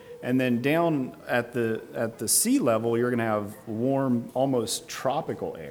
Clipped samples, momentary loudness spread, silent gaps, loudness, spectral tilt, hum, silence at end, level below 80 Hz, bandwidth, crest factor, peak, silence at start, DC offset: under 0.1%; 8 LU; none; -26 LUFS; -4.5 dB/octave; none; 0 s; -68 dBFS; over 20 kHz; 16 dB; -10 dBFS; 0 s; under 0.1%